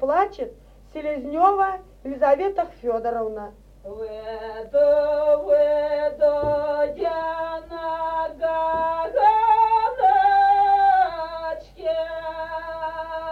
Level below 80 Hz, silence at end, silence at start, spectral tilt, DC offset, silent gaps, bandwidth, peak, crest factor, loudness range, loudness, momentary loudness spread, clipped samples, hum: -50 dBFS; 0 s; 0 s; -6 dB/octave; under 0.1%; none; 6 kHz; -6 dBFS; 16 dB; 5 LU; -21 LUFS; 16 LU; under 0.1%; none